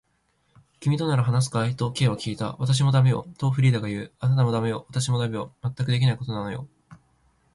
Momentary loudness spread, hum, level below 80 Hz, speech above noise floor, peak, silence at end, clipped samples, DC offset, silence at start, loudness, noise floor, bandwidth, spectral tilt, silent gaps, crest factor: 10 LU; none; -56 dBFS; 46 dB; -10 dBFS; 0.6 s; under 0.1%; under 0.1%; 0.8 s; -24 LUFS; -69 dBFS; 11.5 kHz; -6 dB/octave; none; 14 dB